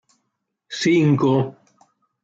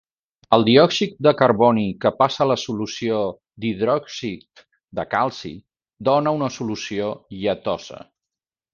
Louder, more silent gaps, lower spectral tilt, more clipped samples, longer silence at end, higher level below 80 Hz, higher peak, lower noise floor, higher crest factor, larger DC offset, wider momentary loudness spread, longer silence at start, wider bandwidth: about the same, -19 LUFS vs -20 LUFS; second, none vs 4.84-4.88 s; about the same, -6.5 dB/octave vs -5.5 dB/octave; neither; about the same, 0.75 s vs 0.8 s; second, -66 dBFS vs -56 dBFS; second, -6 dBFS vs 0 dBFS; second, -76 dBFS vs -88 dBFS; about the same, 16 dB vs 20 dB; neither; about the same, 13 LU vs 14 LU; first, 0.7 s vs 0.5 s; about the same, 8 kHz vs 7.4 kHz